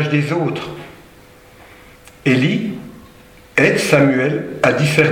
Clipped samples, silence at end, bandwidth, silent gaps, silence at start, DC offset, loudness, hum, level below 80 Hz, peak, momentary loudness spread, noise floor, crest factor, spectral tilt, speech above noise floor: under 0.1%; 0 s; 16.5 kHz; none; 0 s; under 0.1%; -16 LUFS; none; -50 dBFS; 0 dBFS; 16 LU; -44 dBFS; 18 dB; -6 dB/octave; 29 dB